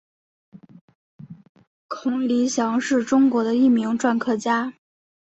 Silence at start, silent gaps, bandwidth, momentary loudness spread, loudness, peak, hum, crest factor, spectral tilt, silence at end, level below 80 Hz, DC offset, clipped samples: 0.55 s; 0.81-0.88 s, 0.95-1.19 s, 1.49-1.55 s, 1.67-1.89 s; 8.2 kHz; 8 LU; -21 LUFS; -6 dBFS; none; 16 dB; -4.5 dB/octave; 0.7 s; -68 dBFS; under 0.1%; under 0.1%